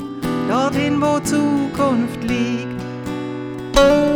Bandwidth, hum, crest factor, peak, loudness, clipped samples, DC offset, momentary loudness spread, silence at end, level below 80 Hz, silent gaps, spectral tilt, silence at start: 19 kHz; none; 18 dB; -2 dBFS; -19 LUFS; under 0.1%; under 0.1%; 12 LU; 0 s; -36 dBFS; none; -5.5 dB/octave; 0 s